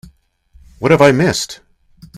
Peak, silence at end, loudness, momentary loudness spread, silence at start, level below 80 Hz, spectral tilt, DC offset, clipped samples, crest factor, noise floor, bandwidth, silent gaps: 0 dBFS; 0 s; -13 LUFS; 16 LU; 0.8 s; -46 dBFS; -5 dB/octave; under 0.1%; 0.1%; 16 dB; -50 dBFS; 15 kHz; none